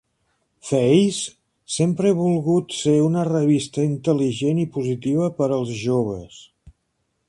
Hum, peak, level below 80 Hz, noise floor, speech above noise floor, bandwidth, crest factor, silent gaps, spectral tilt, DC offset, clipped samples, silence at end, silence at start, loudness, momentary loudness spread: none; -4 dBFS; -56 dBFS; -72 dBFS; 52 dB; 11.5 kHz; 18 dB; none; -6.5 dB/octave; under 0.1%; under 0.1%; 0.6 s; 0.65 s; -21 LUFS; 8 LU